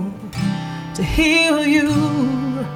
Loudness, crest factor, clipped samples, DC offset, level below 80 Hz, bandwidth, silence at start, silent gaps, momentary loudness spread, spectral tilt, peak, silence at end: -18 LUFS; 14 dB; under 0.1%; under 0.1%; -34 dBFS; 16 kHz; 0 s; none; 12 LU; -5 dB/octave; -4 dBFS; 0 s